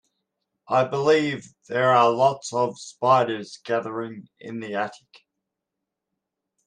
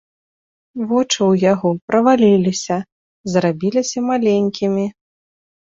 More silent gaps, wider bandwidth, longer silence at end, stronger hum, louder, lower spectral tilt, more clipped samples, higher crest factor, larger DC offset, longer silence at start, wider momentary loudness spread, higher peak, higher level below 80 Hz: second, none vs 1.82-1.88 s, 2.92-3.24 s; first, 10 kHz vs 7.8 kHz; first, 1.7 s vs 0.85 s; neither; second, -23 LUFS vs -17 LUFS; about the same, -5 dB/octave vs -5.5 dB/octave; neither; about the same, 20 dB vs 16 dB; neither; about the same, 0.7 s vs 0.75 s; first, 16 LU vs 11 LU; second, -6 dBFS vs -2 dBFS; second, -72 dBFS vs -58 dBFS